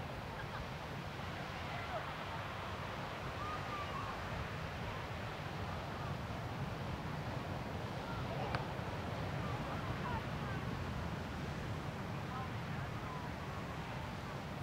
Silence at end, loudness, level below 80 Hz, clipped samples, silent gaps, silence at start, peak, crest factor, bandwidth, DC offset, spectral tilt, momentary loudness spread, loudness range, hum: 0 s; -43 LUFS; -56 dBFS; under 0.1%; none; 0 s; -22 dBFS; 20 dB; 16 kHz; under 0.1%; -6 dB/octave; 3 LU; 2 LU; none